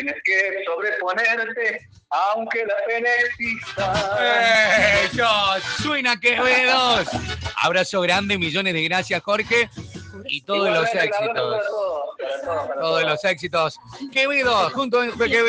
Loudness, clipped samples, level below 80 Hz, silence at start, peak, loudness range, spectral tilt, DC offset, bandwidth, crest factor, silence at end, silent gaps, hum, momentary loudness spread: -20 LUFS; under 0.1%; -50 dBFS; 0 s; -4 dBFS; 5 LU; -3.5 dB/octave; under 0.1%; 10 kHz; 16 dB; 0 s; none; none; 10 LU